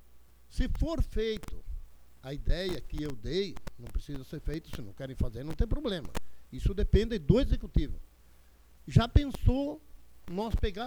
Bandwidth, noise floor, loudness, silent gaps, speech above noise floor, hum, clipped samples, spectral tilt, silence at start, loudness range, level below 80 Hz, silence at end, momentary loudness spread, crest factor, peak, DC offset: 19 kHz; -58 dBFS; -33 LUFS; none; 29 dB; none; under 0.1%; -7 dB/octave; 0.05 s; 8 LU; -34 dBFS; 0 s; 18 LU; 22 dB; -10 dBFS; under 0.1%